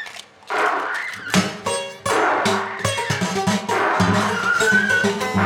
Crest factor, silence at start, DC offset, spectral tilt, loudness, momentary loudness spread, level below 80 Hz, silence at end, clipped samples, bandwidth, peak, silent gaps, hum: 16 dB; 0 s; under 0.1%; -4 dB/octave; -20 LUFS; 9 LU; -56 dBFS; 0 s; under 0.1%; 18.5 kHz; -4 dBFS; none; none